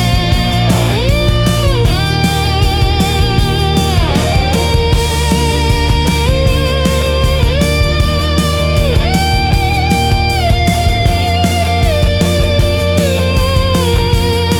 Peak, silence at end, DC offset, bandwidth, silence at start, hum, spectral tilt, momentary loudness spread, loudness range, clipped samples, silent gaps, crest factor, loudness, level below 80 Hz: 0 dBFS; 0 s; under 0.1%; 20 kHz; 0 s; none; -5 dB/octave; 1 LU; 0 LU; under 0.1%; none; 10 dB; -12 LUFS; -18 dBFS